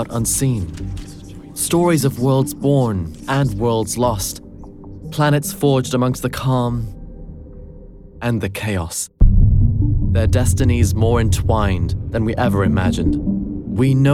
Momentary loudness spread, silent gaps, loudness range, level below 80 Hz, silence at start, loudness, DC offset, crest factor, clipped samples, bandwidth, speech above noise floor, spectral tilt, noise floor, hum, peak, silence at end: 17 LU; none; 4 LU; -24 dBFS; 0 s; -18 LUFS; under 0.1%; 14 dB; under 0.1%; 16.5 kHz; 21 dB; -6 dB/octave; -38 dBFS; none; -2 dBFS; 0 s